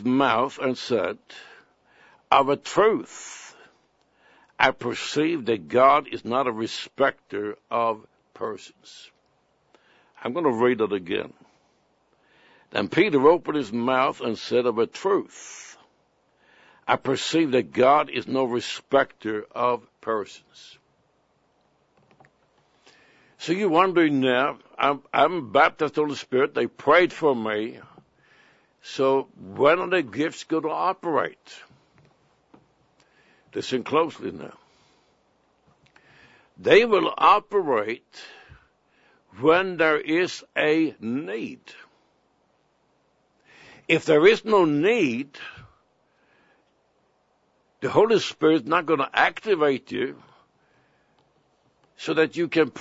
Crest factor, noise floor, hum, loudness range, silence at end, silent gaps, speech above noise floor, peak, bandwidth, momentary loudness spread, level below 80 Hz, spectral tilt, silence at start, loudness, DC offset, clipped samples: 24 dB; -67 dBFS; none; 9 LU; 0 s; none; 44 dB; 0 dBFS; 8 kHz; 17 LU; -66 dBFS; -5 dB/octave; 0 s; -23 LUFS; under 0.1%; under 0.1%